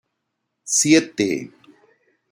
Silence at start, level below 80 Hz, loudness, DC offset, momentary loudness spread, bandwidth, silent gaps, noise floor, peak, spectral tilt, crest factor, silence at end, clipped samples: 0.65 s; -64 dBFS; -18 LUFS; under 0.1%; 24 LU; 16 kHz; none; -77 dBFS; -2 dBFS; -3 dB/octave; 20 dB; 0.85 s; under 0.1%